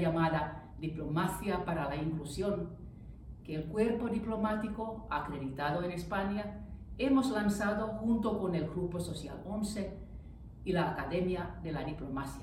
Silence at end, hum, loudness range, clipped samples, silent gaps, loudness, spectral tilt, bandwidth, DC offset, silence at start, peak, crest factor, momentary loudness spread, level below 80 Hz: 0 s; none; 4 LU; under 0.1%; none; -35 LUFS; -6.5 dB/octave; 16 kHz; under 0.1%; 0 s; -18 dBFS; 16 dB; 12 LU; -50 dBFS